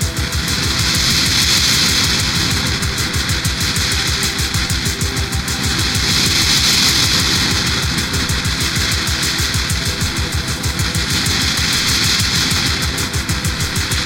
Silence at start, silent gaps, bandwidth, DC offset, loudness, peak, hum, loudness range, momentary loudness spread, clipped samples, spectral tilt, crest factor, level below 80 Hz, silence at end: 0 s; none; 17 kHz; under 0.1%; -14 LUFS; -2 dBFS; none; 3 LU; 7 LU; under 0.1%; -2 dB/octave; 14 dB; -26 dBFS; 0 s